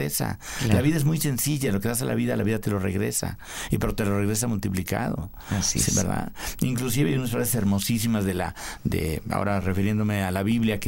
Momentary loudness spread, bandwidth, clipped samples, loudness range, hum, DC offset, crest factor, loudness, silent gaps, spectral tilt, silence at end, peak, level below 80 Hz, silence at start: 7 LU; 16.5 kHz; under 0.1%; 2 LU; none; under 0.1%; 18 dB; -25 LUFS; none; -5 dB/octave; 0 s; -6 dBFS; -42 dBFS; 0 s